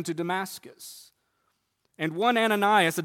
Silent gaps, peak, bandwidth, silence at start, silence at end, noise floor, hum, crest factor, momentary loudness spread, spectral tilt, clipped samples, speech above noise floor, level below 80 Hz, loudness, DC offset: none; -8 dBFS; 17.5 kHz; 0 s; 0 s; -75 dBFS; none; 20 dB; 22 LU; -4 dB/octave; under 0.1%; 49 dB; -76 dBFS; -25 LUFS; under 0.1%